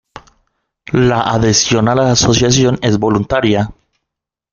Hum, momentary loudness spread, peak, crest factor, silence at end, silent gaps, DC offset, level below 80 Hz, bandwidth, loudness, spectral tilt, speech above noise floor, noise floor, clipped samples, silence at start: none; 5 LU; 0 dBFS; 14 dB; 0.8 s; none; under 0.1%; -38 dBFS; 7.4 kHz; -12 LUFS; -4.5 dB/octave; 68 dB; -80 dBFS; under 0.1%; 0.9 s